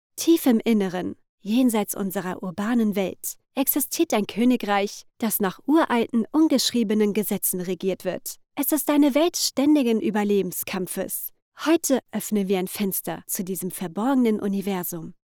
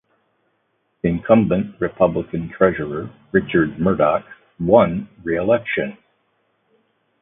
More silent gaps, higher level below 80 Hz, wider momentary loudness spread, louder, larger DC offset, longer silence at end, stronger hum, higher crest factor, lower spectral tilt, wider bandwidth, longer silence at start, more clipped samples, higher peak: first, 1.29-1.38 s, 11.42-11.52 s vs none; second, -62 dBFS vs -46 dBFS; about the same, 10 LU vs 11 LU; second, -23 LUFS vs -19 LUFS; neither; second, 0.2 s vs 1.25 s; neither; second, 14 dB vs 20 dB; second, -4.5 dB/octave vs -12 dB/octave; first, over 20 kHz vs 3.8 kHz; second, 0.15 s vs 1.05 s; neither; second, -8 dBFS vs 0 dBFS